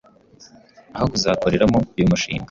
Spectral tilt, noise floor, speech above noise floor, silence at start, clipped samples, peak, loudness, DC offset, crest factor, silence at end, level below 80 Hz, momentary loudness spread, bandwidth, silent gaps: -5.5 dB/octave; -49 dBFS; 31 dB; 0.4 s; under 0.1%; -4 dBFS; -19 LUFS; under 0.1%; 18 dB; 0.05 s; -40 dBFS; 6 LU; 7.6 kHz; none